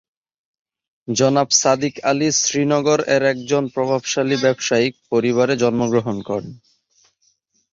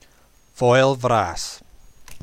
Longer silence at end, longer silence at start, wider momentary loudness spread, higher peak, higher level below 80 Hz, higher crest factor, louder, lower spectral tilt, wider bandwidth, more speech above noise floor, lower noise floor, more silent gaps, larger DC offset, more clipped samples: first, 1.15 s vs 0.05 s; first, 1.1 s vs 0.6 s; second, 9 LU vs 15 LU; about the same, -2 dBFS vs -4 dBFS; second, -60 dBFS vs -48 dBFS; about the same, 18 dB vs 16 dB; about the same, -18 LUFS vs -19 LUFS; second, -3.5 dB/octave vs -5 dB/octave; second, 7.8 kHz vs 15 kHz; first, 46 dB vs 36 dB; first, -64 dBFS vs -54 dBFS; neither; neither; neither